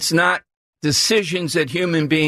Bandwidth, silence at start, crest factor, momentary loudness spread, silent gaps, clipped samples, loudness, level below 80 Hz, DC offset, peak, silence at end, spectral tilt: 14 kHz; 0 s; 14 dB; 6 LU; 0.56-0.73 s; under 0.1%; -18 LUFS; -56 dBFS; under 0.1%; -4 dBFS; 0 s; -3.5 dB/octave